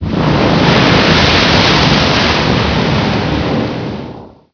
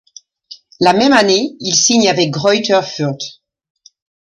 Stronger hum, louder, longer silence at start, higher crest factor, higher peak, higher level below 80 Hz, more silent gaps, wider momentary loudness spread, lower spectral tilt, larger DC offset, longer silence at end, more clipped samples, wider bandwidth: neither; first, -10 LUFS vs -13 LUFS; second, 0 s vs 0.5 s; about the same, 12 dB vs 14 dB; about the same, 0 dBFS vs 0 dBFS; first, -26 dBFS vs -56 dBFS; neither; about the same, 11 LU vs 11 LU; first, -5.5 dB/octave vs -3 dB/octave; first, 0.2% vs under 0.1%; second, 0.25 s vs 0.95 s; first, 0.2% vs under 0.1%; second, 5.4 kHz vs 11 kHz